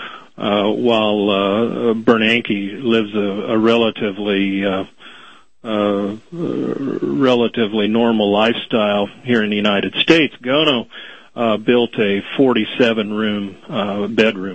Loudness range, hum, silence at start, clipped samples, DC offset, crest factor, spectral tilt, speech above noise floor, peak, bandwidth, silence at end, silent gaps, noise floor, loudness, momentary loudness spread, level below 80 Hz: 4 LU; none; 0 s; under 0.1%; 0.4%; 16 dB; -6 dB/octave; 28 dB; 0 dBFS; 8.4 kHz; 0 s; none; -44 dBFS; -17 LUFS; 9 LU; -56 dBFS